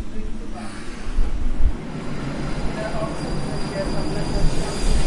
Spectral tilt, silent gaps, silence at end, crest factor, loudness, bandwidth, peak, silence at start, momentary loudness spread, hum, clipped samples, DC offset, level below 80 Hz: -5.5 dB/octave; none; 0 s; 14 dB; -27 LUFS; 11.5 kHz; -6 dBFS; 0 s; 9 LU; none; under 0.1%; under 0.1%; -24 dBFS